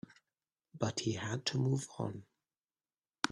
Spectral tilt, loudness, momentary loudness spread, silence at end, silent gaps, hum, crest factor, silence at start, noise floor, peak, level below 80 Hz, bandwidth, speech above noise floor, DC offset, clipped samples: -4.5 dB/octave; -37 LUFS; 10 LU; 0 s; none; none; 30 dB; 0.75 s; under -90 dBFS; -10 dBFS; -72 dBFS; 11.5 kHz; over 54 dB; under 0.1%; under 0.1%